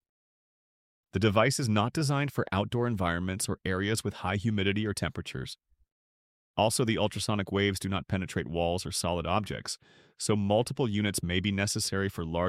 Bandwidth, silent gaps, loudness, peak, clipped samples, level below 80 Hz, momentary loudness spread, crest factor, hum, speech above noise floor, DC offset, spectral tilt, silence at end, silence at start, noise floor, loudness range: 15.5 kHz; 5.92-6.54 s; -30 LUFS; -10 dBFS; under 0.1%; -54 dBFS; 9 LU; 20 dB; none; over 61 dB; under 0.1%; -5 dB/octave; 0 s; 1.15 s; under -90 dBFS; 3 LU